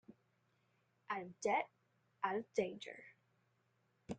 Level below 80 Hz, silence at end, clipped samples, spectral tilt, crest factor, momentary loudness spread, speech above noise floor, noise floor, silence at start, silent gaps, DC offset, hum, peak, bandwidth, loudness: -80 dBFS; 0 s; under 0.1%; -4.5 dB/octave; 22 dB; 14 LU; 38 dB; -80 dBFS; 0.1 s; none; under 0.1%; 60 Hz at -70 dBFS; -22 dBFS; 9 kHz; -42 LUFS